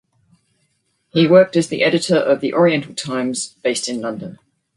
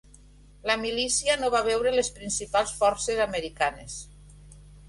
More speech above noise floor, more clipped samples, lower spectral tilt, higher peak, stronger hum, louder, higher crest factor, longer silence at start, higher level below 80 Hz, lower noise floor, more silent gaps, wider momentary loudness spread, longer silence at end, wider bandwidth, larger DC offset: first, 50 dB vs 26 dB; neither; first, -5 dB/octave vs -1.5 dB/octave; first, 0 dBFS vs -10 dBFS; second, none vs 50 Hz at -50 dBFS; first, -17 LUFS vs -26 LUFS; about the same, 18 dB vs 18 dB; first, 1.15 s vs 0.65 s; second, -62 dBFS vs -50 dBFS; first, -66 dBFS vs -52 dBFS; neither; first, 12 LU vs 9 LU; first, 0.4 s vs 0 s; about the same, 11.5 kHz vs 11.5 kHz; neither